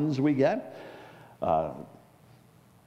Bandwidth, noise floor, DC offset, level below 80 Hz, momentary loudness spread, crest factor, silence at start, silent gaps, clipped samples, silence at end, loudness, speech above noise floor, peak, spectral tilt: 11 kHz; -58 dBFS; under 0.1%; -62 dBFS; 24 LU; 18 dB; 0 s; none; under 0.1%; 1 s; -28 LUFS; 30 dB; -12 dBFS; -8 dB/octave